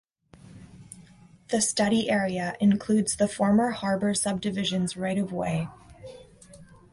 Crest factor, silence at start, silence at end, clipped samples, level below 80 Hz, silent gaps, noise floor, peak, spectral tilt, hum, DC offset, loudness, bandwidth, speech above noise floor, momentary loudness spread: 16 dB; 0.45 s; 0.3 s; under 0.1%; -58 dBFS; none; -53 dBFS; -12 dBFS; -4.5 dB/octave; none; under 0.1%; -26 LUFS; 11.5 kHz; 28 dB; 23 LU